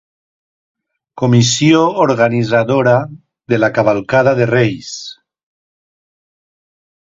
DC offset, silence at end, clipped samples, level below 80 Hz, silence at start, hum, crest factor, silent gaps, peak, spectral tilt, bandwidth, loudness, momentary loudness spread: under 0.1%; 1.85 s; under 0.1%; -52 dBFS; 1.15 s; none; 16 dB; none; 0 dBFS; -5.5 dB/octave; 7.8 kHz; -13 LUFS; 14 LU